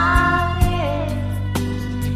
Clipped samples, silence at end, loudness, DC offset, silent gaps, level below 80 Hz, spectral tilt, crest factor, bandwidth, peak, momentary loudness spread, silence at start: under 0.1%; 0 s; -20 LUFS; under 0.1%; none; -26 dBFS; -6 dB/octave; 16 dB; 15 kHz; -4 dBFS; 8 LU; 0 s